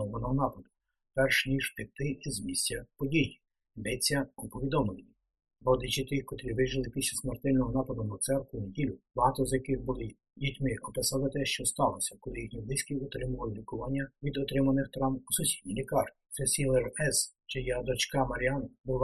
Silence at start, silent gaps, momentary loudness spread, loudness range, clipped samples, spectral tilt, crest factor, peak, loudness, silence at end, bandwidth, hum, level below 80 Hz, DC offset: 0 s; 18.80-18.84 s; 8 LU; 3 LU; under 0.1%; -4 dB/octave; 20 dB; -12 dBFS; -32 LUFS; 0 s; 12.5 kHz; none; -48 dBFS; under 0.1%